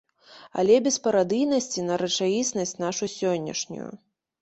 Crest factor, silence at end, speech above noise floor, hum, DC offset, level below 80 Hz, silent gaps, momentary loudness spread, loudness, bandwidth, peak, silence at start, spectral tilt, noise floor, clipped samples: 18 dB; 0.45 s; 27 dB; none; under 0.1%; -68 dBFS; none; 12 LU; -25 LUFS; 8.2 kHz; -8 dBFS; 0.3 s; -3.5 dB/octave; -51 dBFS; under 0.1%